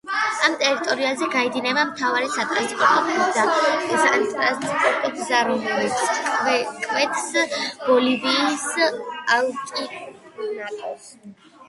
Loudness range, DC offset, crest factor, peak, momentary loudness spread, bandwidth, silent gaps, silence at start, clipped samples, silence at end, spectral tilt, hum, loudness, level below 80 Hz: 3 LU; under 0.1%; 20 dB; -2 dBFS; 11 LU; 11.5 kHz; none; 0.05 s; under 0.1%; 0.05 s; -2 dB/octave; none; -21 LUFS; -70 dBFS